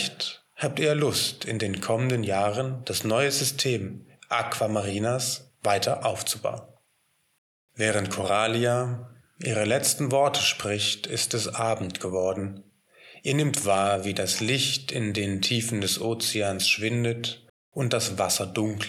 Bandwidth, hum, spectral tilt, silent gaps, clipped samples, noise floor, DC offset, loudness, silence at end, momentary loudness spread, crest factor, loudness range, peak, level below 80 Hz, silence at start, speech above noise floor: 17.5 kHz; none; -3.5 dB/octave; 7.38-7.68 s, 17.50-17.72 s; under 0.1%; -70 dBFS; under 0.1%; -26 LUFS; 0 s; 8 LU; 16 dB; 3 LU; -10 dBFS; -68 dBFS; 0 s; 44 dB